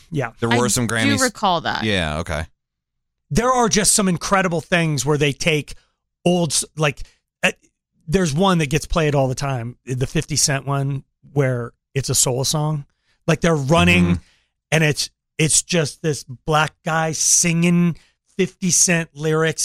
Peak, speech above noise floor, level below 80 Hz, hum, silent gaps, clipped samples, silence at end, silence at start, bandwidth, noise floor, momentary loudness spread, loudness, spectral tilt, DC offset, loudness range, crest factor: -4 dBFS; 59 dB; -40 dBFS; none; none; under 0.1%; 0 s; 0.1 s; 16 kHz; -78 dBFS; 11 LU; -19 LUFS; -4 dB/octave; under 0.1%; 3 LU; 16 dB